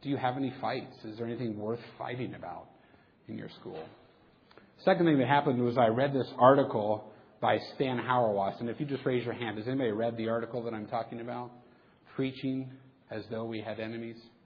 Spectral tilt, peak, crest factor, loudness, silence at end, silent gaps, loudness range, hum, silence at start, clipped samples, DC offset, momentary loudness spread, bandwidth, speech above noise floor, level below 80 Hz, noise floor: -9 dB/octave; -8 dBFS; 24 dB; -31 LUFS; 0.15 s; none; 12 LU; none; 0 s; under 0.1%; under 0.1%; 18 LU; 5.4 kHz; 31 dB; -72 dBFS; -62 dBFS